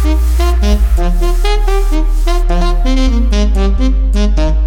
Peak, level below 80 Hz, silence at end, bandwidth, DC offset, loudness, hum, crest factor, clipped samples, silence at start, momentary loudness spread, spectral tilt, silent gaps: 0 dBFS; -10 dBFS; 0 s; 13.5 kHz; under 0.1%; -14 LUFS; none; 8 dB; under 0.1%; 0 s; 3 LU; -6.5 dB/octave; none